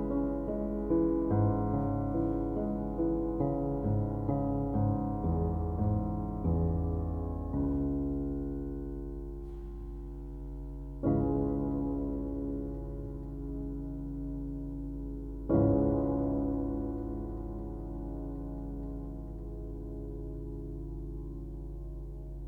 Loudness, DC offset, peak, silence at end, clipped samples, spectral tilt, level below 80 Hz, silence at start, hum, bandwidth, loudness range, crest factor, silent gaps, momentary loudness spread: -34 LUFS; under 0.1%; -14 dBFS; 0 s; under 0.1%; -12.5 dB/octave; -40 dBFS; 0 s; none; 2.4 kHz; 10 LU; 18 dB; none; 14 LU